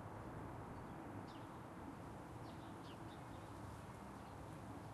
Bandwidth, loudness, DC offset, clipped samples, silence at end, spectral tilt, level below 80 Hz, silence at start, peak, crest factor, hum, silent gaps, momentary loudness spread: 12.5 kHz; -53 LUFS; under 0.1%; under 0.1%; 0 s; -6.5 dB/octave; -64 dBFS; 0 s; -40 dBFS; 12 dB; none; none; 2 LU